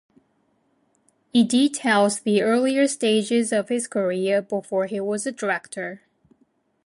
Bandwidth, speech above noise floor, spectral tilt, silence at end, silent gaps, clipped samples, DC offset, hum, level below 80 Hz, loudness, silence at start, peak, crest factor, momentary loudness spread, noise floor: 11.5 kHz; 45 dB; -4 dB/octave; 0.9 s; none; under 0.1%; under 0.1%; none; -74 dBFS; -22 LUFS; 1.35 s; -8 dBFS; 16 dB; 7 LU; -67 dBFS